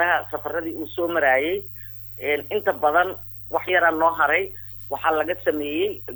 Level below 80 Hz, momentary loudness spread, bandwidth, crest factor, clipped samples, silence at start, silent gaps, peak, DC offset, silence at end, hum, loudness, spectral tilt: -56 dBFS; 12 LU; over 20 kHz; 16 dB; under 0.1%; 0 s; none; -6 dBFS; under 0.1%; 0 s; none; -22 LUFS; -6 dB/octave